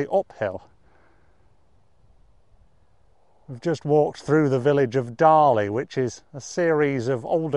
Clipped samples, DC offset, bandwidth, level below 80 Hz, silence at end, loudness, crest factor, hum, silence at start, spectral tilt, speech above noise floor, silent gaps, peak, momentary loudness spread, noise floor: under 0.1%; 0.1%; 11 kHz; -62 dBFS; 0 s; -22 LUFS; 20 dB; none; 0 s; -7 dB/octave; 41 dB; none; -4 dBFS; 13 LU; -62 dBFS